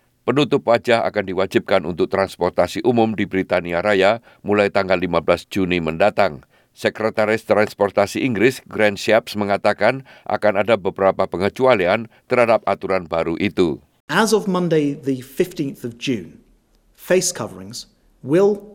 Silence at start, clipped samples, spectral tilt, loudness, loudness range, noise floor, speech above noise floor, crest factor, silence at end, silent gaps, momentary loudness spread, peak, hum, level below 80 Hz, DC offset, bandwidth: 0.25 s; under 0.1%; -5 dB/octave; -19 LUFS; 3 LU; -57 dBFS; 38 dB; 18 dB; 0.05 s; 14.00-14.08 s; 8 LU; -2 dBFS; none; -56 dBFS; under 0.1%; 17 kHz